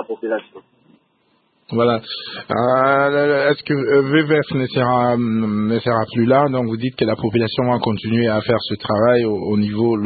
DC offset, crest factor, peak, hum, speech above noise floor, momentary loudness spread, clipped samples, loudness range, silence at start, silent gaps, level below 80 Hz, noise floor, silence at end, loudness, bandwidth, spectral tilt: under 0.1%; 16 dB; -2 dBFS; none; 45 dB; 8 LU; under 0.1%; 2 LU; 0 s; none; -54 dBFS; -62 dBFS; 0 s; -18 LUFS; 4.8 kHz; -12 dB/octave